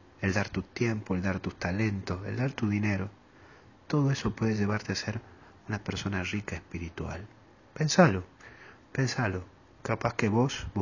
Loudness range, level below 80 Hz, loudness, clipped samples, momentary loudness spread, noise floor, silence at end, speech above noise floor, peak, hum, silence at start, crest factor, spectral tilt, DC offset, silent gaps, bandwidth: 4 LU; -50 dBFS; -30 LUFS; under 0.1%; 13 LU; -55 dBFS; 0 s; 26 dB; -6 dBFS; none; 0.2 s; 24 dB; -6 dB/octave; under 0.1%; none; 7.4 kHz